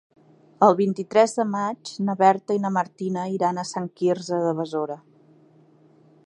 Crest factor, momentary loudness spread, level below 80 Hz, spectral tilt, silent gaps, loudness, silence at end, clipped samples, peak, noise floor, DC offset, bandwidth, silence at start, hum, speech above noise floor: 22 dB; 10 LU; -76 dBFS; -6 dB/octave; none; -23 LUFS; 1.25 s; under 0.1%; -2 dBFS; -55 dBFS; under 0.1%; 10.5 kHz; 0.6 s; none; 33 dB